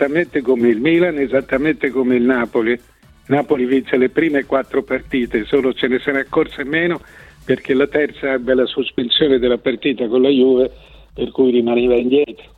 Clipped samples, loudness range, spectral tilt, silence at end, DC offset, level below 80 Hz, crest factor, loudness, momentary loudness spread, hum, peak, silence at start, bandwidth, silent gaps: under 0.1%; 3 LU; -7 dB/octave; 0.25 s; under 0.1%; -46 dBFS; 14 dB; -17 LUFS; 6 LU; none; -2 dBFS; 0 s; 4.9 kHz; none